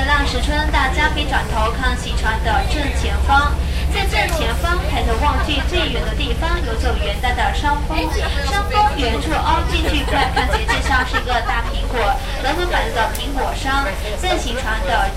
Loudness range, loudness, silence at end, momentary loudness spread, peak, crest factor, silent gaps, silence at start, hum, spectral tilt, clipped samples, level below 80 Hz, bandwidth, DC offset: 2 LU; -18 LUFS; 0 s; 4 LU; -2 dBFS; 16 dB; none; 0 s; none; -4.5 dB/octave; under 0.1%; -20 dBFS; 15.5 kHz; under 0.1%